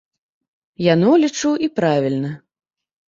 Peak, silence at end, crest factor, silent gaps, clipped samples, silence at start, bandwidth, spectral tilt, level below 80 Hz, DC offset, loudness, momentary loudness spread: -2 dBFS; 0.7 s; 16 dB; none; under 0.1%; 0.8 s; 7.6 kHz; -6 dB/octave; -62 dBFS; under 0.1%; -17 LUFS; 12 LU